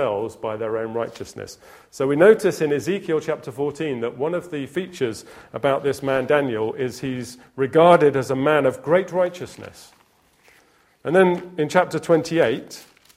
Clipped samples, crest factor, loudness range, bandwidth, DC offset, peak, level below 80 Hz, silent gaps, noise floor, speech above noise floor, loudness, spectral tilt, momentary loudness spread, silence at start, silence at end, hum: under 0.1%; 22 dB; 5 LU; 15.5 kHz; under 0.1%; 0 dBFS; -60 dBFS; none; -59 dBFS; 38 dB; -21 LUFS; -6 dB/octave; 19 LU; 0 s; 0.35 s; none